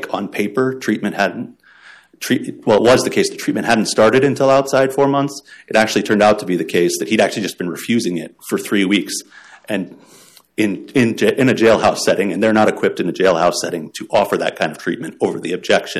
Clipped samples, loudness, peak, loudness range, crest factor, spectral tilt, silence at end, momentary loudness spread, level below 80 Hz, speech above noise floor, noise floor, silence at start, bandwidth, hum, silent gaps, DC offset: under 0.1%; -16 LUFS; -2 dBFS; 5 LU; 14 dB; -4.5 dB/octave; 0 s; 11 LU; -54 dBFS; 29 dB; -45 dBFS; 0 s; 15 kHz; none; none; under 0.1%